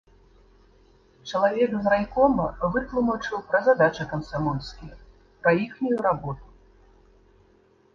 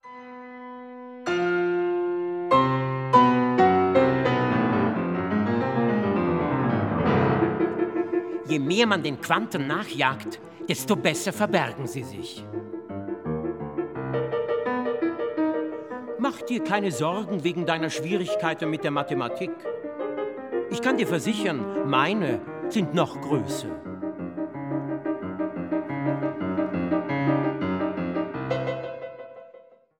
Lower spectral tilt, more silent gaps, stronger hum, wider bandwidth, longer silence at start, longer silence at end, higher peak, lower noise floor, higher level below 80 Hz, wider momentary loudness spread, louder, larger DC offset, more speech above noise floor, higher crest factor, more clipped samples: about the same, -7 dB/octave vs -6 dB/octave; neither; neither; second, 7.2 kHz vs 17.5 kHz; first, 1.25 s vs 0.05 s; first, 1.5 s vs 0.4 s; about the same, -6 dBFS vs -4 dBFS; first, -59 dBFS vs -52 dBFS; first, -48 dBFS vs -58 dBFS; about the same, 14 LU vs 13 LU; about the same, -24 LUFS vs -25 LUFS; neither; first, 36 dB vs 26 dB; about the same, 20 dB vs 20 dB; neither